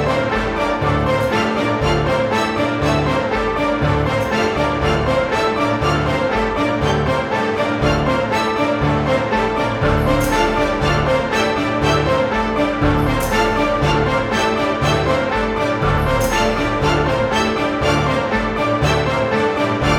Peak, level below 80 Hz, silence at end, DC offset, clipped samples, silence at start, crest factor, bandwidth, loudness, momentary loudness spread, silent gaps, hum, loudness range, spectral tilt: -2 dBFS; -30 dBFS; 0 s; under 0.1%; under 0.1%; 0 s; 14 dB; 17.5 kHz; -17 LUFS; 2 LU; none; none; 1 LU; -5.5 dB/octave